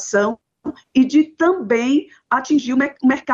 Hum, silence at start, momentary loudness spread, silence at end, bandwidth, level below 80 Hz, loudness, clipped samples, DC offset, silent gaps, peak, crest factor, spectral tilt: none; 0 s; 8 LU; 0 s; 7.8 kHz; -60 dBFS; -18 LUFS; under 0.1%; under 0.1%; none; -6 dBFS; 12 dB; -4.5 dB/octave